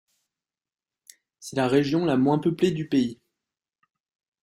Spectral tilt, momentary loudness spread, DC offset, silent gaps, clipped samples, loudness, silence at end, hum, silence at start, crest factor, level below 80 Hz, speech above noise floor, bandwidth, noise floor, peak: -6.5 dB/octave; 9 LU; under 0.1%; none; under 0.1%; -24 LUFS; 1.3 s; none; 1.4 s; 18 dB; -64 dBFS; over 67 dB; 12.5 kHz; under -90 dBFS; -8 dBFS